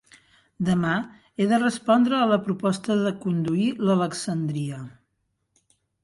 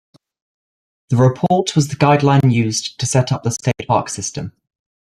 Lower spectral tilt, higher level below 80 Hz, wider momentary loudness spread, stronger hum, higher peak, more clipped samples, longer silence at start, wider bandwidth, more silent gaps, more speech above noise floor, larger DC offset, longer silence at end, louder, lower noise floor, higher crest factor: about the same, -6 dB/octave vs -5.5 dB/octave; second, -62 dBFS vs -50 dBFS; about the same, 10 LU vs 11 LU; neither; second, -8 dBFS vs -2 dBFS; neither; second, 0.6 s vs 1.1 s; second, 11.5 kHz vs 13 kHz; neither; second, 52 dB vs over 74 dB; neither; first, 1.15 s vs 0.55 s; second, -24 LUFS vs -16 LUFS; second, -75 dBFS vs under -90 dBFS; about the same, 16 dB vs 16 dB